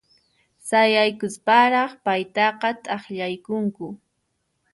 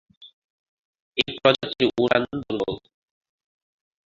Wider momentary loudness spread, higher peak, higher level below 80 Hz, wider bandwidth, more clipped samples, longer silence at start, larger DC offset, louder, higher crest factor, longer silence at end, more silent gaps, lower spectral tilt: first, 13 LU vs 10 LU; second, -4 dBFS vs 0 dBFS; second, -70 dBFS vs -58 dBFS; first, 11.5 kHz vs 7.6 kHz; neither; first, 0.65 s vs 0.2 s; neither; about the same, -21 LUFS vs -23 LUFS; second, 18 dB vs 26 dB; second, 0.75 s vs 1.25 s; second, none vs 0.33-0.94 s, 1.00-1.12 s; second, -4 dB/octave vs -5.5 dB/octave